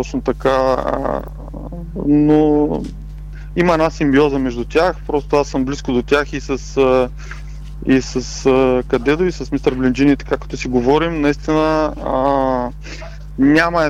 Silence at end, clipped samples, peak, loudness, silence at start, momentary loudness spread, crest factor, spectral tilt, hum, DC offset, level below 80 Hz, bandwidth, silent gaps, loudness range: 0 s; under 0.1%; -4 dBFS; -16 LUFS; 0 s; 17 LU; 12 dB; -6 dB/octave; none; under 0.1%; -30 dBFS; 10 kHz; none; 2 LU